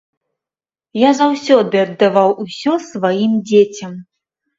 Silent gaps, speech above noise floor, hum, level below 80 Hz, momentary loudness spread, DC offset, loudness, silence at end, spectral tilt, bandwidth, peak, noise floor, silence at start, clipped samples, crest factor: none; over 76 dB; none; -64 dBFS; 12 LU; under 0.1%; -14 LUFS; 0.55 s; -5.5 dB/octave; 7.8 kHz; 0 dBFS; under -90 dBFS; 0.95 s; under 0.1%; 16 dB